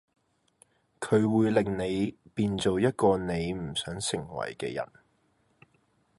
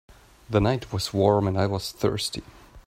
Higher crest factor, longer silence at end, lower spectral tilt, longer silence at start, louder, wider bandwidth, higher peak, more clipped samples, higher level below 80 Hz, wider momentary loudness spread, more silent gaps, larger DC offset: about the same, 20 dB vs 20 dB; first, 1.35 s vs 0.05 s; about the same, -5.5 dB/octave vs -6 dB/octave; first, 1 s vs 0.1 s; second, -28 LUFS vs -25 LUFS; second, 11.5 kHz vs 16 kHz; second, -10 dBFS vs -6 dBFS; neither; second, -54 dBFS vs -46 dBFS; about the same, 10 LU vs 8 LU; neither; neither